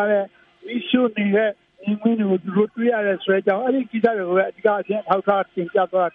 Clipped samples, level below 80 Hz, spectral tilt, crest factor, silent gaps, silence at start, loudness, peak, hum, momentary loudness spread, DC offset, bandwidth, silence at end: under 0.1%; -70 dBFS; -9.5 dB/octave; 18 dB; none; 0 s; -21 LUFS; -2 dBFS; none; 5 LU; under 0.1%; 4.4 kHz; 0.05 s